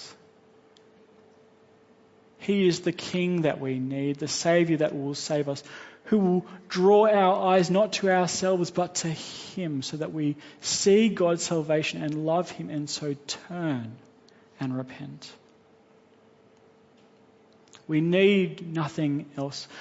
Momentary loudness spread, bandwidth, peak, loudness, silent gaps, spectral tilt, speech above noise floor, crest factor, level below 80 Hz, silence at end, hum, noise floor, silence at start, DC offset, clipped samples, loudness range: 14 LU; 8 kHz; -8 dBFS; -26 LUFS; none; -5 dB/octave; 33 dB; 18 dB; -70 dBFS; 0 s; none; -58 dBFS; 0 s; under 0.1%; under 0.1%; 13 LU